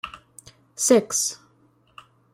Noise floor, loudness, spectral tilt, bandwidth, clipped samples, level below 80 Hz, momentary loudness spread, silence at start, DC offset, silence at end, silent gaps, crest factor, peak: -61 dBFS; -21 LUFS; -2.5 dB/octave; 16 kHz; under 0.1%; -64 dBFS; 25 LU; 0.05 s; under 0.1%; 1 s; none; 22 dB; -4 dBFS